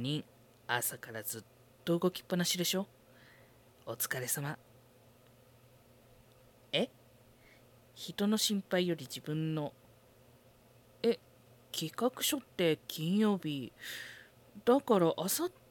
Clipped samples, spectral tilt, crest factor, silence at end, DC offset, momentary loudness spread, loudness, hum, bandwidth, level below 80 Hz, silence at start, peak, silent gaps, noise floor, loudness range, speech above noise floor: under 0.1%; -4 dB/octave; 22 dB; 0.2 s; under 0.1%; 14 LU; -34 LUFS; none; 18 kHz; -76 dBFS; 0 s; -16 dBFS; none; -63 dBFS; 9 LU; 29 dB